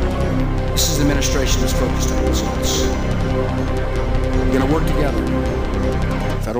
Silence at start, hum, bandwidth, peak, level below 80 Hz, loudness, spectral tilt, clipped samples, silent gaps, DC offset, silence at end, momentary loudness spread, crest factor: 0 s; none; 16 kHz; -4 dBFS; -22 dBFS; -19 LUFS; -5 dB/octave; under 0.1%; none; under 0.1%; 0 s; 4 LU; 14 dB